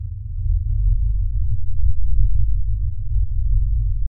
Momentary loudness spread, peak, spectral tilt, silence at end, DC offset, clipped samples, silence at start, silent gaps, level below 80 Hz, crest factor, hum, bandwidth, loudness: 4 LU; -4 dBFS; -14.5 dB/octave; 0 s; under 0.1%; under 0.1%; 0 s; none; -20 dBFS; 12 dB; none; 0.2 kHz; -24 LUFS